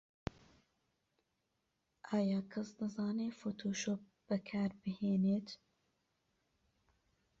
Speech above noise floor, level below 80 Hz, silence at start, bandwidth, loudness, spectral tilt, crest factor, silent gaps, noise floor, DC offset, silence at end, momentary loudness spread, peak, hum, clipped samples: 47 dB; -70 dBFS; 2.05 s; 7.8 kHz; -39 LUFS; -7 dB/octave; 22 dB; none; -84 dBFS; under 0.1%; 1.85 s; 14 LU; -20 dBFS; none; under 0.1%